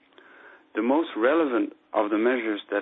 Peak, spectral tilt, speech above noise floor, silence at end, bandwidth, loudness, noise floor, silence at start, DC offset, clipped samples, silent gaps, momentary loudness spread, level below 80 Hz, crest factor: -8 dBFS; -8.5 dB/octave; 27 dB; 0 s; 4 kHz; -25 LUFS; -52 dBFS; 0.45 s; under 0.1%; under 0.1%; none; 6 LU; -74 dBFS; 18 dB